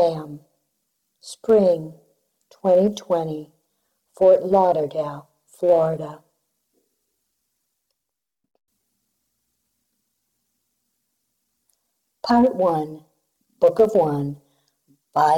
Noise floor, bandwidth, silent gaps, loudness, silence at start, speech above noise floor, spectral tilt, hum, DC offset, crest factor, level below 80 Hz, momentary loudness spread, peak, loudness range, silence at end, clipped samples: -84 dBFS; 12.5 kHz; none; -20 LUFS; 0 s; 65 dB; -7 dB/octave; none; under 0.1%; 16 dB; -62 dBFS; 17 LU; -6 dBFS; 6 LU; 0 s; under 0.1%